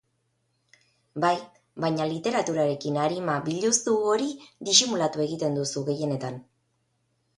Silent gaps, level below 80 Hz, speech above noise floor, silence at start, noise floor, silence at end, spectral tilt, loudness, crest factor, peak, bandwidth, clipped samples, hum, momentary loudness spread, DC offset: none; -70 dBFS; 48 dB; 1.15 s; -73 dBFS; 0.95 s; -3.5 dB/octave; -25 LUFS; 24 dB; -4 dBFS; 11.5 kHz; under 0.1%; none; 13 LU; under 0.1%